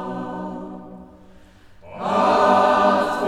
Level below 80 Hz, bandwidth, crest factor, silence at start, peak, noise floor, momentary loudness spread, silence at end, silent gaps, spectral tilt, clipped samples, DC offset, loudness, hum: -54 dBFS; 13 kHz; 16 dB; 0 s; -4 dBFS; -47 dBFS; 19 LU; 0 s; none; -5.5 dB/octave; under 0.1%; under 0.1%; -18 LUFS; none